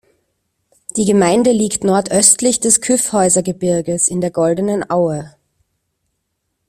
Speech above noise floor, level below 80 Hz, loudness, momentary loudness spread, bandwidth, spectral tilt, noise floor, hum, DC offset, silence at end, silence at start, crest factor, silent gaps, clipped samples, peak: 57 dB; -52 dBFS; -14 LUFS; 8 LU; 16 kHz; -4 dB/octave; -71 dBFS; none; under 0.1%; 1.4 s; 0.95 s; 16 dB; none; under 0.1%; 0 dBFS